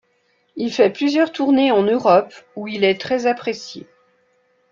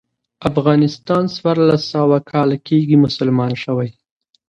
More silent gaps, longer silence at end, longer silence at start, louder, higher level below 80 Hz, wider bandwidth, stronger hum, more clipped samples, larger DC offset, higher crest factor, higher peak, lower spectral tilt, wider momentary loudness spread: neither; first, 0.9 s vs 0.55 s; first, 0.55 s vs 0.4 s; about the same, -18 LUFS vs -16 LUFS; second, -64 dBFS vs -50 dBFS; about the same, 7.4 kHz vs 7.4 kHz; neither; neither; neither; about the same, 18 dB vs 16 dB; about the same, -2 dBFS vs 0 dBFS; second, -5.5 dB/octave vs -8 dB/octave; first, 18 LU vs 7 LU